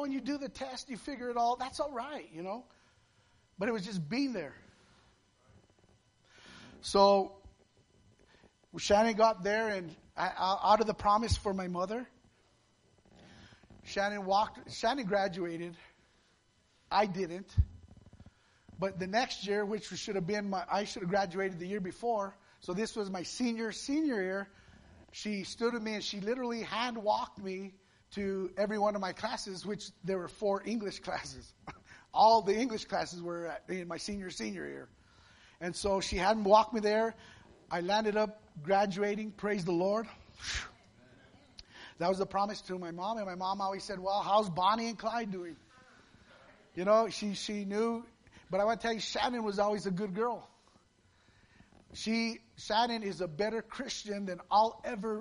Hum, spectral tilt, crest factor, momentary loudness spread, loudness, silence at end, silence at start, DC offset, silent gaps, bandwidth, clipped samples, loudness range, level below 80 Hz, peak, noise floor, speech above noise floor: none; -4.5 dB/octave; 24 dB; 14 LU; -33 LUFS; 0 s; 0 s; under 0.1%; none; 10.5 kHz; under 0.1%; 7 LU; -54 dBFS; -10 dBFS; -70 dBFS; 37 dB